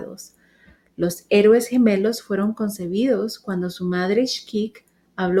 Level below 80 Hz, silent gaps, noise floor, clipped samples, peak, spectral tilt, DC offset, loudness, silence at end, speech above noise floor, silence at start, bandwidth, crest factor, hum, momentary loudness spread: -58 dBFS; none; -55 dBFS; under 0.1%; -6 dBFS; -5.5 dB/octave; under 0.1%; -21 LUFS; 0 s; 35 dB; 0 s; 16 kHz; 16 dB; none; 11 LU